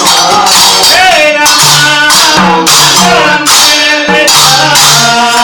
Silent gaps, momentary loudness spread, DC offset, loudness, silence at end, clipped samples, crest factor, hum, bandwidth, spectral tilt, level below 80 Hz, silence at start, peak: none; 3 LU; under 0.1%; -3 LUFS; 0 s; 4%; 4 dB; none; over 20 kHz; -1 dB/octave; -38 dBFS; 0 s; 0 dBFS